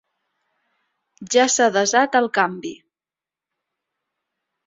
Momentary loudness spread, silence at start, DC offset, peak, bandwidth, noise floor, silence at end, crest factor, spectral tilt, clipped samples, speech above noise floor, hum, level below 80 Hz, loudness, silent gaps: 11 LU; 1.2 s; under 0.1%; -2 dBFS; 8 kHz; under -90 dBFS; 1.95 s; 20 dB; -2 dB/octave; under 0.1%; over 72 dB; none; -70 dBFS; -18 LUFS; none